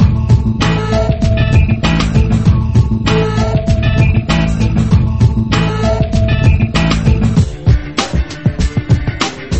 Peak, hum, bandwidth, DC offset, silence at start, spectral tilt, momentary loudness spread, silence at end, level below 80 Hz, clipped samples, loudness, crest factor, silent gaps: 0 dBFS; none; 8.6 kHz; under 0.1%; 0 s; -6.5 dB/octave; 4 LU; 0 s; -18 dBFS; under 0.1%; -13 LUFS; 12 dB; none